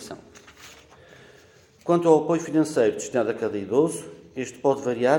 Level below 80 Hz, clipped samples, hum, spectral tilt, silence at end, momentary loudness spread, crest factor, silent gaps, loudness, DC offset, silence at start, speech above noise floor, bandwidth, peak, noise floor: -68 dBFS; under 0.1%; none; -6 dB/octave; 0 s; 18 LU; 20 dB; none; -23 LUFS; under 0.1%; 0 s; 32 dB; 17 kHz; -4 dBFS; -54 dBFS